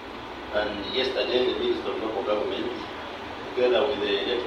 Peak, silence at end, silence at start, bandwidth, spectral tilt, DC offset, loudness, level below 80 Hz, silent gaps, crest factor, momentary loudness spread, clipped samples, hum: -12 dBFS; 0 s; 0 s; 9.4 kHz; -5 dB/octave; under 0.1%; -27 LUFS; -54 dBFS; none; 16 dB; 12 LU; under 0.1%; none